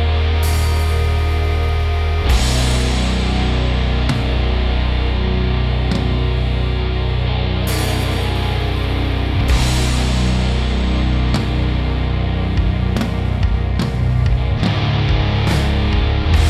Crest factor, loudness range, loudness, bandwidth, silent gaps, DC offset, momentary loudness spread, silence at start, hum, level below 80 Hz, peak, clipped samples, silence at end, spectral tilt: 14 dB; 1 LU; -18 LUFS; 13.5 kHz; none; under 0.1%; 3 LU; 0 s; none; -18 dBFS; -2 dBFS; under 0.1%; 0 s; -6 dB/octave